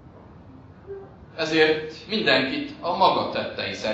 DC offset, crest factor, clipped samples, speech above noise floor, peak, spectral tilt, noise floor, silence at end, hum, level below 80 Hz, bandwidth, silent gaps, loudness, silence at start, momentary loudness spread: under 0.1%; 22 dB; under 0.1%; 23 dB; -4 dBFS; -4.5 dB/octave; -46 dBFS; 0 s; none; -56 dBFS; 8 kHz; none; -23 LUFS; 0.05 s; 20 LU